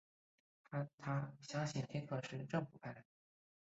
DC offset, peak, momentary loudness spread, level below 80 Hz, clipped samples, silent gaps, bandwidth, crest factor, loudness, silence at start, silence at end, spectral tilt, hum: under 0.1%; -26 dBFS; 10 LU; -80 dBFS; under 0.1%; 0.94-0.98 s; 8 kHz; 20 dB; -45 LUFS; 0.7 s; 0.6 s; -6 dB/octave; none